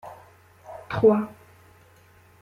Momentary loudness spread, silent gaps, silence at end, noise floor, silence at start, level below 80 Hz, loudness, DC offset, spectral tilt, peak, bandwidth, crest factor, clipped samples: 24 LU; none; 1.1 s; -55 dBFS; 0.05 s; -62 dBFS; -23 LUFS; under 0.1%; -8.5 dB/octave; -8 dBFS; 11.5 kHz; 20 dB; under 0.1%